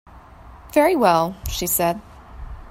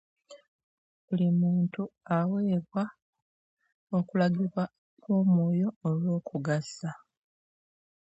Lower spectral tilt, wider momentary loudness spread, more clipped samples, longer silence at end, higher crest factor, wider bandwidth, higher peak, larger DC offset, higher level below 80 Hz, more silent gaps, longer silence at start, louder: second, -4 dB/octave vs -8.5 dB/octave; first, 23 LU vs 11 LU; neither; second, 0 s vs 1.15 s; about the same, 18 dB vs 16 dB; first, 16.5 kHz vs 8 kHz; first, -4 dBFS vs -14 dBFS; neither; first, -38 dBFS vs -74 dBFS; second, none vs 0.48-1.08 s, 3.02-3.13 s, 3.22-3.57 s, 3.74-3.87 s, 4.78-4.97 s, 5.76-5.81 s; second, 0.15 s vs 0.3 s; first, -19 LUFS vs -29 LUFS